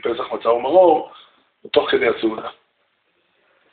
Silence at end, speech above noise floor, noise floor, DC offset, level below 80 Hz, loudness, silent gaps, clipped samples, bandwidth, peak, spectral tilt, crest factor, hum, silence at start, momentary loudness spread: 1.2 s; 49 dB; -66 dBFS; under 0.1%; -62 dBFS; -18 LUFS; none; under 0.1%; 4.6 kHz; -2 dBFS; -2 dB/octave; 18 dB; none; 0.05 s; 17 LU